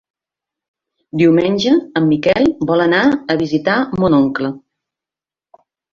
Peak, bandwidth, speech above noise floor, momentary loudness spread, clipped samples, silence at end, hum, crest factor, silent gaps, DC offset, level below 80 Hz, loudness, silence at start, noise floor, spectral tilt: -2 dBFS; 7.2 kHz; 75 dB; 7 LU; under 0.1%; 1.35 s; none; 14 dB; none; under 0.1%; -50 dBFS; -14 LUFS; 1.15 s; -89 dBFS; -6.5 dB/octave